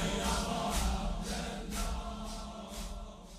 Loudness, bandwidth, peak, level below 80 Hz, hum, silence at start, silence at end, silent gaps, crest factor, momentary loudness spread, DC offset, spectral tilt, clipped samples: -37 LUFS; 15.5 kHz; -20 dBFS; -40 dBFS; none; 0 s; 0 s; none; 16 dB; 11 LU; under 0.1%; -4 dB/octave; under 0.1%